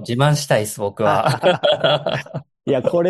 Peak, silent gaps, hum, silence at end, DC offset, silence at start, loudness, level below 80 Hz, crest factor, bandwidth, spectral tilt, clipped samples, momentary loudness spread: -2 dBFS; none; none; 0 s; under 0.1%; 0 s; -18 LUFS; -58 dBFS; 16 dB; 12.5 kHz; -5 dB/octave; under 0.1%; 9 LU